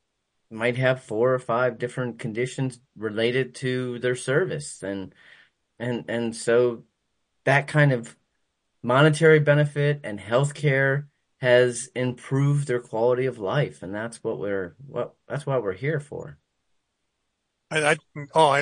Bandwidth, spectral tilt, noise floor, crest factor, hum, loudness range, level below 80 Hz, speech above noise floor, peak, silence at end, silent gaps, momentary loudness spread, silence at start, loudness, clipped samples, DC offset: 10.5 kHz; -6 dB/octave; -78 dBFS; 20 dB; none; 8 LU; -68 dBFS; 54 dB; -4 dBFS; 0 s; none; 13 LU; 0.5 s; -24 LUFS; under 0.1%; under 0.1%